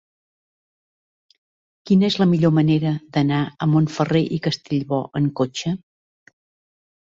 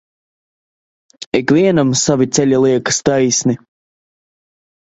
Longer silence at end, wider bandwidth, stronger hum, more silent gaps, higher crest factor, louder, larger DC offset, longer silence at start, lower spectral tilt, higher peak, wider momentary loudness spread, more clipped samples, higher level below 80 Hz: about the same, 1.25 s vs 1.3 s; about the same, 7.6 kHz vs 8.2 kHz; neither; second, none vs 1.26-1.32 s; about the same, 16 dB vs 16 dB; second, -20 LUFS vs -14 LUFS; neither; first, 1.85 s vs 1.2 s; first, -7 dB/octave vs -4.5 dB/octave; second, -6 dBFS vs 0 dBFS; about the same, 8 LU vs 7 LU; neither; second, -58 dBFS vs -52 dBFS